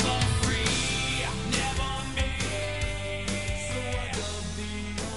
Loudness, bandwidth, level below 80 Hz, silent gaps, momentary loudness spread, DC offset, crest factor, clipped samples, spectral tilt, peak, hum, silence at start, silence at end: -29 LUFS; 11.5 kHz; -36 dBFS; none; 8 LU; 0.7%; 16 dB; under 0.1%; -3.5 dB/octave; -12 dBFS; none; 0 s; 0 s